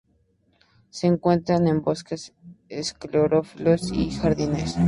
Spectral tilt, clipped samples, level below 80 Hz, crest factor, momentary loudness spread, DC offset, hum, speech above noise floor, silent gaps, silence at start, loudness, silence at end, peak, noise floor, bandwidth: -6.5 dB/octave; under 0.1%; -44 dBFS; 18 dB; 14 LU; under 0.1%; none; 42 dB; none; 0.95 s; -23 LUFS; 0 s; -6 dBFS; -65 dBFS; 11 kHz